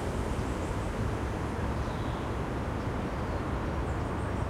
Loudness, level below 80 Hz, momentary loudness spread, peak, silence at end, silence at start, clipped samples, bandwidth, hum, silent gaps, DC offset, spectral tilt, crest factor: -33 LUFS; -38 dBFS; 1 LU; -20 dBFS; 0 s; 0 s; under 0.1%; 15 kHz; none; none; under 0.1%; -7 dB/octave; 12 dB